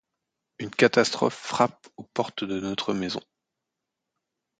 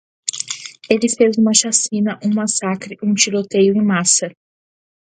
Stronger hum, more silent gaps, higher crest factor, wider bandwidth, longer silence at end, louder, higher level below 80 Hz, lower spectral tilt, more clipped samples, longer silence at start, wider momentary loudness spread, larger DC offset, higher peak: neither; neither; first, 24 dB vs 18 dB; about the same, 9.4 kHz vs 9.8 kHz; first, 1.4 s vs 0.7 s; second, -26 LUFS vs -16 LUFS; about the same, -66 dBFS vs -64 dBFS; first, -4.5 dB/octave vs -3 dB/octave; neither; first, 0.6 s vs 0.25 s; about the same, 13 LU vs 11 LU; neither; second, -4 dBFS vs 0 dBFS